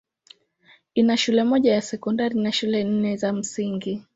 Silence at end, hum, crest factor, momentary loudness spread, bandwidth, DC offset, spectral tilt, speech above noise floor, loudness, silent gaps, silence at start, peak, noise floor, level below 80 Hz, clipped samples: 0.15 s; none; 16 dB; 8 LU; 8 kHz; under 0.1%; -5 dB/octave; 36 dB; -22 LUFS; none; 0.95 s; -8 dBFS; -57 dBFS; -64 dBFS; under 0.1%